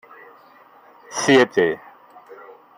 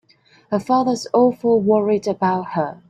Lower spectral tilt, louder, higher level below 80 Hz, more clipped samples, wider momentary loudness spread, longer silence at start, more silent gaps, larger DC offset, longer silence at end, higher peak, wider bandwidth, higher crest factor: second, -3.5 dB/octave vs -6.5 dB/octave; about the same, -18 LUFS vs -19 LUFS; about the same, -66 dBFS vs -62 dBFS; neither; first, 16 LU vs 8 LU; first, 1.1 s vs 0.5 s; neither; neither; first, 0.45 s vs 0.15 s; about the same, -2 dBFS vs -4 dBFS; first, 16 kHz vs 11 kHz; about the same, 20 dB vs 16 dB